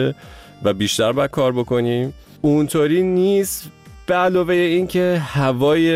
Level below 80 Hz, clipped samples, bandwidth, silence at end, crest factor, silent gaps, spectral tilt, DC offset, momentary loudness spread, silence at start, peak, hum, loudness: -48 dBFS; under 0.1%; 16 kHz; 0 s; 12 dB; none; -5.5 dB/octave; under 0.1%; 7 LU; 0 s; -6 dBFS; none; -18 LUFS